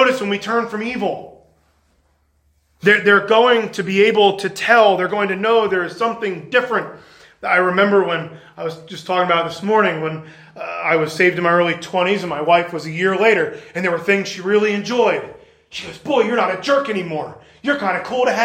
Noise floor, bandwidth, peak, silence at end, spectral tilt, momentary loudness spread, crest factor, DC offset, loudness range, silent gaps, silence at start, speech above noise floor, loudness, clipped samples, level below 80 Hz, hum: -61 dBFS; 16 kHz; 0 dBFS; 0 s; -5 dB/octave; 15 LU; 18 dB; under 0.1%; 5 LU; none; 0 s; 44 dB; -17 LUFS; under 0.1%; -62 dBFS; none